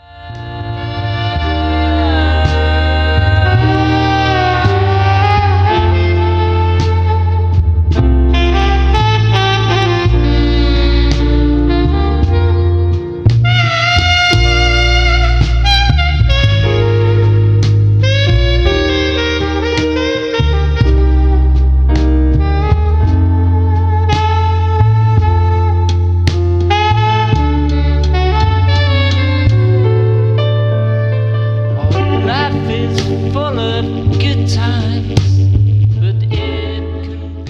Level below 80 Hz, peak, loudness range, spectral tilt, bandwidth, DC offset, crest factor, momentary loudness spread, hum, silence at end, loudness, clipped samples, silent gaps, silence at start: -16 dBFS; 0 dBFS; 3 LU; -6.5 dB/octave; 7.2 kHz; under 0.1%; 10 dB; 5 LU; none; 0 s; -12 LUFS; under 0.1%; none; 0.15 s